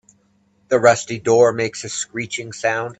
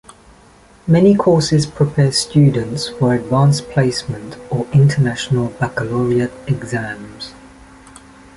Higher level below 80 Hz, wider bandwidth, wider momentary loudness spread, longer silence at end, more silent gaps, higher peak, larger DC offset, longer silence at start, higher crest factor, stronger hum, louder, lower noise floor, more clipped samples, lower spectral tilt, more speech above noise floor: second, -62 dBFS vs -44 dBFS; second, 9.2 kHz vs 11.5 kHz; second, 11 LU vs 15 LU; second, 0.05 s vs 1.05 s; neither; about the same, 0 dBFS vs -2 dBFS; neither; second, 0.7 s vs 0.85 s; first, 20 dB vs 14 dB; neither; about the same, -18 LUFS vs -16 LUFS; first, -60 dBFS vs -46 dBFS; neither; second, -4 dB/octave vs -6 dB/octave; first, 42 dB vs 31 dB